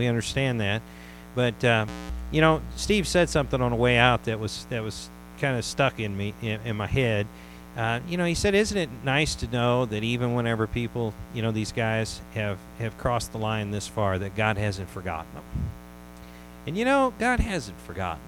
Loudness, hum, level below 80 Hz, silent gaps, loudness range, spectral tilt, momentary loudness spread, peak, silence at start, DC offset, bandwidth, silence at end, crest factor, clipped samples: -26 LUFS; 60 Hz at -45 dBFS; -42 dBFS; none; 5 LU; -5 dB/octave; 14 LU; -4 dBFS; 0 s; under 0.1%; 17.5 kHz; 0 s; 22 dB; under 0.1%